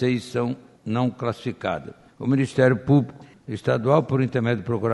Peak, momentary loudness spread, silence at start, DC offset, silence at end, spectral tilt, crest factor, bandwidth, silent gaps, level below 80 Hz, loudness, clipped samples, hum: -4 dBFS; 14 LU; 0 s; under 0.1%; 0 s; -8 dB/octave; 20 dB; 11.5 kHz; none; -56 dBFS; -23 LUFS; under 0.1%; none